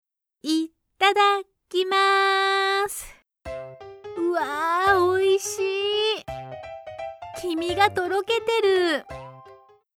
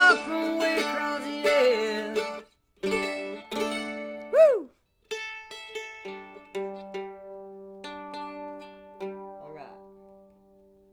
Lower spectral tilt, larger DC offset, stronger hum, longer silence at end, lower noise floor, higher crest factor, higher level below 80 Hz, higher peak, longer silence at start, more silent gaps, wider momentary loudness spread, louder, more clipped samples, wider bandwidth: about the same, -3 dB/octave vs -3 dB/octave; neither; neither; second, 0.45 s vs 0.8 s; second, -51 dBFS vs -58 dBFS; about the same, 18 dB vs 20 dB; first, -56 dBFS vs -68 dBFS; about the same, -6 dBFS vs -8 dBFS; first, 0.45 s vs 0 s; neither; second, 18 LU vs 22 LU; first, -22 LUFS vs -28 LUFS; neither; about the same, 17.5 kHz vs 18 kHz